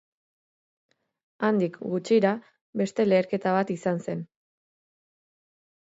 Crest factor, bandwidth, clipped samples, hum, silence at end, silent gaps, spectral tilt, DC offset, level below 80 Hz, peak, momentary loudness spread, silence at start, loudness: 18 dB; 8 kHz; under 0.1%; none; 1.6 s; 2.61-2.73 s; -7 dB/octave; under 0.1%; -76 dBFS; -10 dBFS; 12 LU; 1.4 s; -26 LUFS